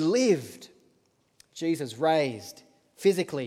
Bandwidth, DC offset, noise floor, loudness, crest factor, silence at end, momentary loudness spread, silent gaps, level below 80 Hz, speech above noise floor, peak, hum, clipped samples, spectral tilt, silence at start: 15.5 kHz; under 0.1%; -68 dBFS; -27 LUFS; 18 dB; 0 s; 21 LU; none; -78 dBFS; 42 dB; -10 dBFS; none; under 0.1%; -5 dB/octave; 0 s